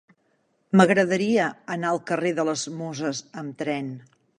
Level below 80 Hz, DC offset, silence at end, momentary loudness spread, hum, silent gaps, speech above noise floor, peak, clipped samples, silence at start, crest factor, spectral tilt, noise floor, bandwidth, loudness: -72 dBFS; under 0.1%; 0.4 s; 14 LU; none; none; 45 dB; -4 dBFS; under 0.1%; 0.75 s; 22 dB; -5.5 dB/octave; -68 dBFS; 10.5 kHz; -24 LUFS